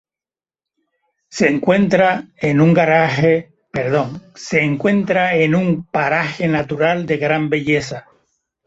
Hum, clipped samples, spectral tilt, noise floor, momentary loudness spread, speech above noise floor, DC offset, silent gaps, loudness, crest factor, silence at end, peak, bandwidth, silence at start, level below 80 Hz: none; under 0.1%; -6.5 dB/octave; under -90 dBFS; 8 LU; over 74 dB; under 0.1%; none; -16 LUFS; 16 dB; 0.65 s; -2 dBFS; 8 kHz; 1.3 s; -52 dBFS